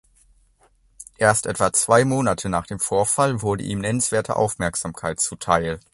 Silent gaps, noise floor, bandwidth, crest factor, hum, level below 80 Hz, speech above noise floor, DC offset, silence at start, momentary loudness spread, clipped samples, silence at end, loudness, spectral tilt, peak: none; -59 dBFS; 12 kHz; 22 dB; none; -46 dBFS; 38 dB; under 0.1%; 1 s; 8 LU; under 0.1%; 0.15 s; -21 LUFS; -4 dB/octave; 0 dBFS